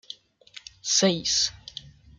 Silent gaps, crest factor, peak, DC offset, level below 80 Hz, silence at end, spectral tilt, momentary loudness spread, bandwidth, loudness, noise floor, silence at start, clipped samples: none; 20 dB; -8 dBFS; under 0.1%; -58 dBFS; 0.3 s; -2.5 dB/octave; 22 LU; 11 kHz; -23 LUFS; -50 dBFS; 0.1 s; under 0.1%